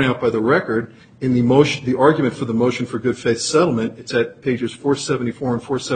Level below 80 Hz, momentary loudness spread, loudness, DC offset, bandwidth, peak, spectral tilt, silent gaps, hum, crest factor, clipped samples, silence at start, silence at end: -54 dBFS; 8 LU; -19 LUFS; under 0.1%; 9.4 kHz; 0 dBFS; -5.5 dB/octave; none; none; 18 dB; under 0.1%; 0 s; 0 s